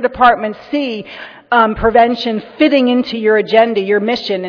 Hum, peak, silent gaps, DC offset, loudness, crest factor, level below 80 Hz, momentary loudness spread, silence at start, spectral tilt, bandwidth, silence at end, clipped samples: none; 0 dBFS; none; under 0.1%; -13 LUFS; 14 dB; -40 dBFS; 9 LU; 0 s; -6.5 dB/octave; 5.4 kHz; 0 s; under 0.1%